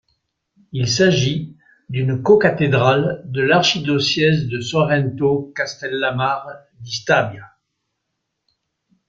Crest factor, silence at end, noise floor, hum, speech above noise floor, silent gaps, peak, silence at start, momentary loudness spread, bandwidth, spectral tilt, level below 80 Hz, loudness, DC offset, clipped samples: 18 dB; 1.6 s; -76 dBFS; none; 58 dB; none; -2 dBFS; 0.75 s; 13 LU; 7.6 kHz; -5 dB/octave; -54 dBFS; -18 LUFS; under 0.1%; under 0.1%